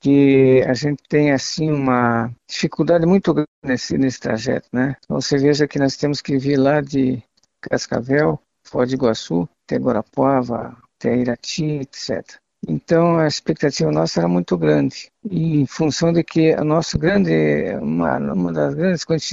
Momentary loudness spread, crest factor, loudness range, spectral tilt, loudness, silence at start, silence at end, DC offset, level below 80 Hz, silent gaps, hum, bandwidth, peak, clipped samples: 9 LU; 14 dB; 3 LU; -6 dB/octave; -19 LUFS; 0.05 s; 0 s; under 0.1%; -48 dBFS; 3.48-3.62 s; none; 7.8 kHz; -4 dBFS; under 0.1%